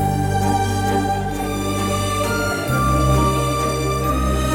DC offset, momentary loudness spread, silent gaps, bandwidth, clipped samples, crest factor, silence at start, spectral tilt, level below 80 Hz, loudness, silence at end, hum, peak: under 0.1%; 5 LU; none; 18 kHz; under 0.1%; 12 dB; 0 s; -5.5 dB/octave; -28 dBFS; -19 LUFS; 0 s; none; -6 dBFS